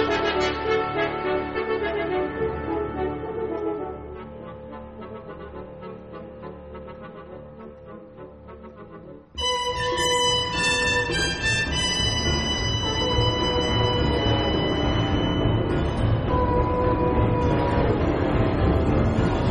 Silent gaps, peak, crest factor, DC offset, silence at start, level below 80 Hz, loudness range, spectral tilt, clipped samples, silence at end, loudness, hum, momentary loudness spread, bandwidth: none; -8 dBFS; 16 dB; under 0.1%; 0 s; -34 dBFS; 17 LU; -4.5 dB/octave; under 0.1%; 0 s; -23 LUFS; none; 19 LU; 11.5 kHz